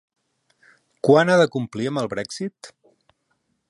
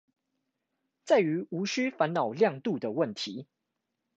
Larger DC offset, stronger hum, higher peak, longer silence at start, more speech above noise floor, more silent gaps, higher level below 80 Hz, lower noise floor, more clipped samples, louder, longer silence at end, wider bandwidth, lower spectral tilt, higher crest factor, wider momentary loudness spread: neither; neither; first, -2 dBFS vs -12 dBFS; about the same, 1.05 s vs 1.05 s; second, 51 dB vs 55 dB; neither; first, -66 dBFS vs -80 dBFS; second, -71 dBFS vs -84 dBFS; neither; first, -21 LUFS vs -29 LUFS; first, 1.05 s vs 0.75 s; first, 11.5 kHz vs 8.2 kHz; about the same, -5.5 dB/octave vs -5.5 dB/octave; about the same, 20 dB vs 18 dB; first, 15 LU vs 9 LU